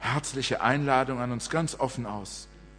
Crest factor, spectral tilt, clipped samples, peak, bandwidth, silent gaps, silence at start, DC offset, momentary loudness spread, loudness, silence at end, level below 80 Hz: 22 dB; -4.5 dB/octave; under 0.1%; -8 dBFS; 10.5 kHz; none; 0 s; under 0.1%; 12 LU; -28 LUFS; 0 s; -52 dBFS